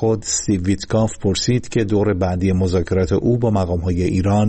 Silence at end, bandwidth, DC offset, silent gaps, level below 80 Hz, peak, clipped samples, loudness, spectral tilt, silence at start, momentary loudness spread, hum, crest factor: 0 s; 8.8 kHz; under 0.1%; none; -36 dBFS; -8 dBFS; under 0.1%; -19 LUFS; -6 dB/octave; 0 s; 2 LU; none; 10 dB